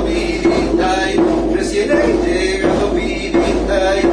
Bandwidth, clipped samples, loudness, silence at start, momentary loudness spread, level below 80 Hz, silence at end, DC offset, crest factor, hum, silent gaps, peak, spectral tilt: 10.5 kHz; under 0.1%; -15 LUFS; 0 s; 3 LU; -28 dBFS; 0 s; under 0.1%; 12 dB; none; none; -2 dBFS; -5 dB/octave